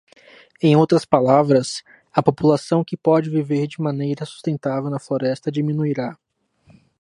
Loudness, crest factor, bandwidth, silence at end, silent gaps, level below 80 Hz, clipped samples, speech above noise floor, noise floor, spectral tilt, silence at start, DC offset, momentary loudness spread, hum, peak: -20 LUFS; 20 dB; 11.5 kHz; 0.9 s; none; -62 dBFS; under 0.1%; 37 dB; -56 dBFS; -7 dB/octave; 0.65 s; under 0.1%; 10 LU; none; 0 dBFS